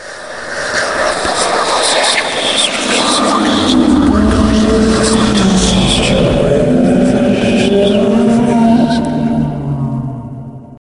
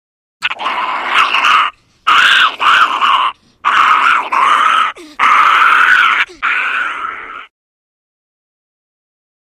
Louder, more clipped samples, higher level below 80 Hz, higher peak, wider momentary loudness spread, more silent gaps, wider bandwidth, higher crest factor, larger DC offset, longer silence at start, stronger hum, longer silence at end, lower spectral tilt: about the same, -11 LUFS vs -10 LUFS; neither; first, -26 dBFS vs -58 dBFS; about the same, 0 dBFS vs 0 dBFS; about the same, 9 LU vs 11 LU; neither; second, 11.5 kHz vs 15 kHz; about the same, 12 dB vs 12 dB; neither; second, 0 s vs 0.4 s; neither; second, 0.05 s vs 2 s; first, -4.5 dB/octave vs 0.5 dB/octave